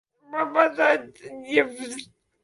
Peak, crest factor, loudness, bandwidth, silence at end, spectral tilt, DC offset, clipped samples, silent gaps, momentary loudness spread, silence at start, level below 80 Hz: -4 dBFS; 20 dB; -23 LUFS; 11.5 kHz; 0.4 s; -3 dB/octave; under 0.1%; under 0.1%; none; 19 LU; 0.3 s; -72 dBFS